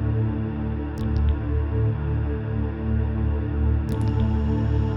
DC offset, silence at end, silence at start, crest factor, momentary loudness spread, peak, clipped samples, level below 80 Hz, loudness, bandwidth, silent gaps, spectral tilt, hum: under 0.1%; 0 s; 0 s; 12 dB; 4 LU; -10 dBFS; under 0.1%; -26 dBFS; -25 LUFS; 5.6 kHz; none; -10 dB/octave; none